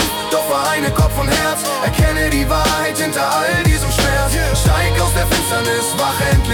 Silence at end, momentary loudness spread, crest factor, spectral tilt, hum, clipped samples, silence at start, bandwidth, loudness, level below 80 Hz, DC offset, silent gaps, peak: 0 s; 2 LU; 12 dB; -4 dB/octave; none; under 0.1%; 0 s; 19 kHz; -15 LUFS; -22 dBFS; under 0.1%; none; -4 dBFS